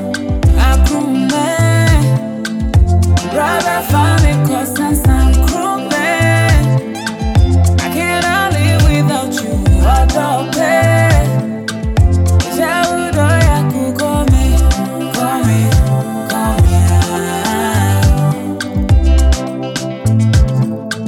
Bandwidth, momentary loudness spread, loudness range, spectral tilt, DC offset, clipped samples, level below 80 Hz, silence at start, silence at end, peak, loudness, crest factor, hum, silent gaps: 17 kHz; 6 LU; 1 LU; -6 dB/octave; under 0.1%; under 0.1%; -16 dBFS; 0 s; 0 s; 0 dBFS; -13 LUFS; 10 dB; none; none